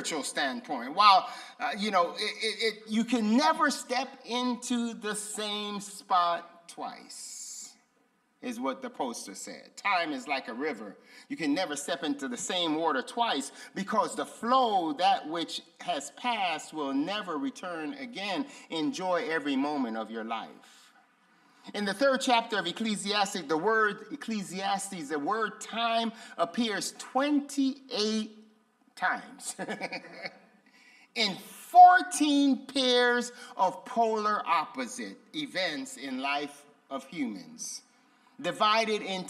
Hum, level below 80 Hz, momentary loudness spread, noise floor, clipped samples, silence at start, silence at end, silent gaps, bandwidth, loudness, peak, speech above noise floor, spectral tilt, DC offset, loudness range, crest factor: none; -82 dBFS; 14 LU; -70 dBFS; under 0.1%; 0 s; 0 s; none; 14.5 kHz; -29 LUFS; -6 dBFS; 41 dB; -3 dB/octave; under 0.1%; 10 LU; 24 dB